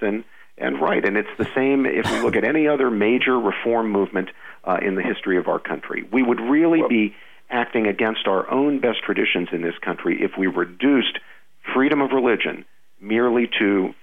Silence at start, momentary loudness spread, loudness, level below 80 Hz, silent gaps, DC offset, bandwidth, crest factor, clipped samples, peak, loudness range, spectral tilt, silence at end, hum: 0 s; 8 LU; -21 LUFS; -60 dBFS; none; 0.5%; 10 kHz; 14 dB; under 0.1%; -6 dBFS; 2 LU; -6 dB/octave; 0.1 s; none